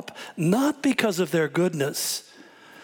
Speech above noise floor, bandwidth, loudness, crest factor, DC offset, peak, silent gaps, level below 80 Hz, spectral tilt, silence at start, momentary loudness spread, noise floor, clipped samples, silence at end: 25 dB; 19 kHz; -24 LUFS; 20 dB; under 0.1%; -6 dBFS; none; -74 dBFS; -4.5 dB/octave; 0 s; 6 LU; -49 dBFS; under 0.1%; 0 s